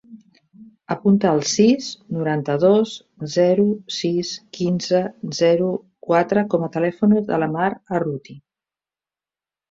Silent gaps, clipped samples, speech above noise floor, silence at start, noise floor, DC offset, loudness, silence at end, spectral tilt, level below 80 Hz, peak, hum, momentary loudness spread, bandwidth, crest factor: none; under 0.1%; over 71 dB; 0.1 s; under -90 dBFS; under 0.1%; -20 LUFS; 1.3 s; -5.5 dB/octave; -62 dBFS; -4 dBFS; none; 11 LU; 7.8 kHz; 16 dB